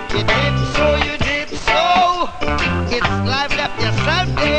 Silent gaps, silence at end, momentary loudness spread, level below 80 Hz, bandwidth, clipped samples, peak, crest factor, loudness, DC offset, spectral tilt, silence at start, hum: none; 0 s; 5 LU; -28 dBFS; 9.2 kHz; under 0.1%; -2 dBFS; 14 dB; -17 LUFS; under 0.1%; -5 dB/octave; 0 s; none